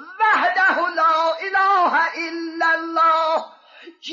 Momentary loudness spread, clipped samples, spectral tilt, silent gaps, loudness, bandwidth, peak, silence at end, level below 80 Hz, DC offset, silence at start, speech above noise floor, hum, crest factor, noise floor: 8 LU; under 0.1%; -2 dB/octave; none; -18 LUFS; 7.6 kHz; -8 dBFS; 0 s; -74 dBFS; under 0.1%; 0 s; 26 dB; none; 12 dB; -45 dBFS